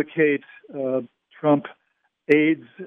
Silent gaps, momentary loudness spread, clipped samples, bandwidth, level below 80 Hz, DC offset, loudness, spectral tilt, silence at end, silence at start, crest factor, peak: none; 19 LU; under 0.1%; 5.2 kHz; -76 dBFS; under 0.1%; -22 LUFS; -8.5 dB/octave; 0 s; 0 s; 20 dB; -4 dBFS